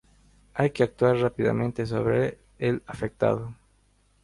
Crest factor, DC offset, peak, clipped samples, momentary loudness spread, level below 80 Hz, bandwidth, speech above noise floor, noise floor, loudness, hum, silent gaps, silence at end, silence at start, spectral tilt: 20 dB; under 0.1%; -8 dBFS; under 0.1%; 9 LU; -54 dBFS; 11.5 kHz; 39 dB; -64 dBFS; -26 LUFS; 50 Hz at -50 dBFS; none; 0.7 s; 0.55 s; -8 dB/octave